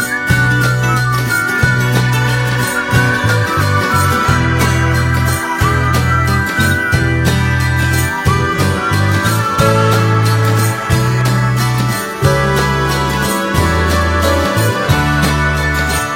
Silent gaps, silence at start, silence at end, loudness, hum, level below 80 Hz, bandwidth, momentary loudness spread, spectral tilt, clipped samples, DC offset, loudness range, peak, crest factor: none; 0 s; 0 s; -13 LUFS; none; -26 dBFS; 16.5 kHz; 2 LU; -5 dB/octave; under 0.1%; under 0.1%; 1 LU; 0 dBFS; 12 dB